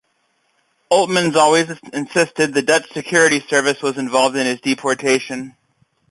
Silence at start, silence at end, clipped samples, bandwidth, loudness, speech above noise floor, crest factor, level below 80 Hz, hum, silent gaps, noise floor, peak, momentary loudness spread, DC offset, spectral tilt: 0.9 s; 0.6 s; under 0.1%; 11.5 kHz; -17 LUFS; 48 dB; 16 dB; -62 dBFS; none; none; -65 dBFS; -2 dBFS; 8 LU; under 0.1%; -3 dB/octave